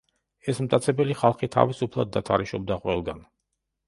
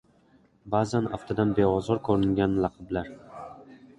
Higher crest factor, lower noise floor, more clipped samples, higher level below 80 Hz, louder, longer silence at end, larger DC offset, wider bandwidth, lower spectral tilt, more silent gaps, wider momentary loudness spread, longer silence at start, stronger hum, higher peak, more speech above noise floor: first, 24 dB vs 18 dB; first, -80 dBFS vs -61 dBFS; neither; about the same, -52 dBFS vs -50 dBFS; about the same, -25 LUFS vs -26 LUFS; first, 0.65 s vs 0.25 s; neither; about the same, 11.5 kHz vs 11 kHz; about the same, -6.5 dB/octave vs -7.5 dB/octave; neither; second, 9 LU vs 19 LU; second, 0.45 s vs 0.65 s; neither; first, -2 dBFS vs -8 dBFS; first, 56 dB vs 35 dB